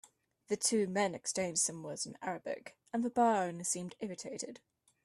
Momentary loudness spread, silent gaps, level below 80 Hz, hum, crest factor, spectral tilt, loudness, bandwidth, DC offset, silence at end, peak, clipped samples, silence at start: 12 LU; none; -78 dBFS; none; 20 dB; -3 dB/octave; -35 LUFS; 12.5 kHz; under 0.1%; 0.5 s; -18 dBFS; under 0.1%; 0.5 s